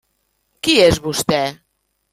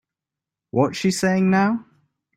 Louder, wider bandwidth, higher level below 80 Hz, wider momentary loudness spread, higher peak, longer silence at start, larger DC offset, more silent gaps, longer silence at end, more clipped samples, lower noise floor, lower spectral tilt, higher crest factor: first, -16 LUFS vs -21 LUFS; first, 16 kHz vs 13.5 kHz; first, -40 dBFS vs -60 dBFS; about the same, 10 LU vs 8 LU; first, 0 dBFS vs -4 dBFS; about the same, 0.65 s vs 0.75 s; neither; neither; about the same, 0.6 s vs 0.55 s; neither; second, -68 dBFS vs -87 dBFS; second, -3.5 dB/octave vs -5.5 dB/octave; about the same, 18 dB vs 18 dB